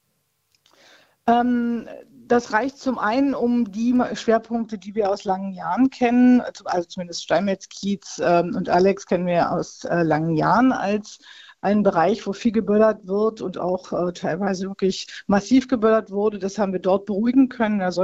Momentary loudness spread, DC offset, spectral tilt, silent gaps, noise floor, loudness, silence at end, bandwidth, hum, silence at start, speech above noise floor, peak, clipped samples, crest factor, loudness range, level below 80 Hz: 9 LU; under 0.1%; -6 dB/octave; none; -71 dBFS; -21 LUFS; 0 s; 8 kHz; none; 1.25 s; 50 dB; -4 dBFS; under 0.1%; 16 dB; 2 LU; -56 dBFS